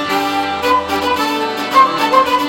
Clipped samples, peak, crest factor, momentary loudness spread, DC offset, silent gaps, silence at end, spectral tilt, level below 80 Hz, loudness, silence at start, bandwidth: under 0.1%; 0 dBFS; 14 dB; 6 LU; under 0.1%; none; 0 s; -3 dB/octave; -46 dBFS; -14 LUFS; 0 s; 17 kHz